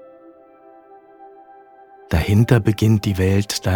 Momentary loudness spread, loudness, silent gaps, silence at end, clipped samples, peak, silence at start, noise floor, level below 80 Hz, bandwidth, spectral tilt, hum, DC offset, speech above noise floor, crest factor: 6 LU; -18 LUFS; none; 0 s; under 0.1%; -2 dBFS; 1.2 s; -47 dBFS; -36 dBFS; 18.5 kHz; -6.5 dB/octave; none; under 0.1%; 31 dB; 18 dB